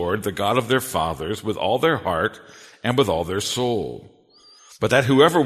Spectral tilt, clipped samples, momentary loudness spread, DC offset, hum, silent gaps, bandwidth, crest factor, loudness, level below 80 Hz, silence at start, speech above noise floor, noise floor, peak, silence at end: -5 dB/octave; under 0.1%; 10 LU; under 0.1%; none; none; 13.5 kHz; 20 dB; -21 LUFS; -50 dBFS; 0 s; 31 dB; -52 dBFS; -2 dBFS; 0 s